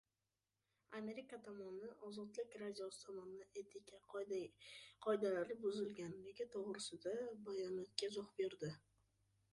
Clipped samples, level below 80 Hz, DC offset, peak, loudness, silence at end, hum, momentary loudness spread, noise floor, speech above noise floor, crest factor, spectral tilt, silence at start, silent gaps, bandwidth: under 0.1%; -86 dBFS; under 0.1%; -22 dBFS; -48 LUFS; 0.75 s; none; 12 LU; under -90 dBFS; over 43 dB; 26 dB; -4.5 dB/octave; 0.9 s; none; 11.5 kHz